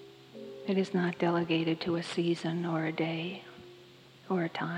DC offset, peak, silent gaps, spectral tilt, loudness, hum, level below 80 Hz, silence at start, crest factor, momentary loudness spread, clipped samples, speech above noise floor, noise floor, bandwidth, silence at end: under 0.1%; -16 dBFS; none; -6.5 dB/octave; -32 LUFS; none; -74 dBFS; 0 s; 18 dB; 19 LU; under 0.1%; 24 dB; -55 dBFS; 10.5 kHz; 0 s